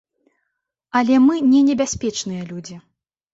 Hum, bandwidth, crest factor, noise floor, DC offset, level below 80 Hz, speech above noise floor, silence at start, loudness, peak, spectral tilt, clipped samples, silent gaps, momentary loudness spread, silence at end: none; 8 kHz; 16 dB; -77 dBFS; under 0.1%; -52 dBFS; 60 dB; 0.95 s; -17 LUFS; -4 dBFS; -4.5 dB/octave; under 0.1%; none; 18 LU; 0.55 s